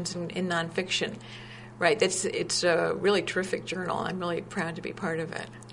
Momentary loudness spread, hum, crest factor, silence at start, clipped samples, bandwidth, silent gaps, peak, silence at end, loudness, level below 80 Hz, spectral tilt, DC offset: 11 LU; none; 22 dB; 0 s; under 0.1%; 11 kHz; none; -8 dBFS; 0 s; -29 LUFS; -62 dBFS; -3.5 dB/octave; under 0.1%